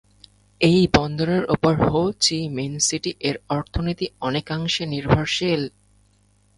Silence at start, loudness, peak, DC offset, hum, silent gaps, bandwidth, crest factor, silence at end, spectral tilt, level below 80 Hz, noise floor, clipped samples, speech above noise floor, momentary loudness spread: 0.6 s; -21 LUFS; 0 dBFS; under 0.1%; none; none; 11.5 kHz; 22 dB; 0.9 s; -4.5 dB/octave; -42 dBFS; -60 dBFS; under 0.1%; 39 dB; 8 LU